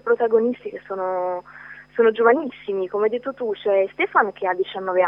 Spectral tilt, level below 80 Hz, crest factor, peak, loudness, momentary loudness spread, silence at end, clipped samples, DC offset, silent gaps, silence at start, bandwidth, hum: -7.5 dB/octave; -66 dBFS; 18 dB; -4 dBFS; -22 LUFS; 13 LU; 0 s; under 0.1%; under 0.1%; none; 0.05 s; 5.4 kHz; none